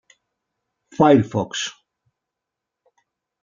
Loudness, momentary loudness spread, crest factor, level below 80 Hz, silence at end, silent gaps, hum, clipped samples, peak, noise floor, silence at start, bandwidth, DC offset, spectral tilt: -19 LUFS; 15 LU; 22 dB; -64 dBFS; 1.7 s; none; none; under 0.1%; -2 dBFS; -84 dBFS; 1 s; 7.6 kHz; under 0.1%; -5.5 dB/octave